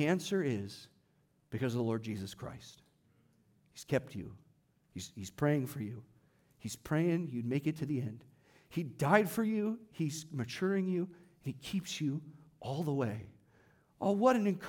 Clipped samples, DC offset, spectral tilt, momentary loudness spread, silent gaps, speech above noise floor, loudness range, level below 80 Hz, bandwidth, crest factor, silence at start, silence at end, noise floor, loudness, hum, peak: under 0.1%; under 0.1%; -6.5 dB/octave; 18 LU; none; 38 dB; 7 LU; -70 dBFS; 18 kHz; 22 dB; 0 s; 0 s; -73 dBFS; -35 LUFS; none; -14 dBFS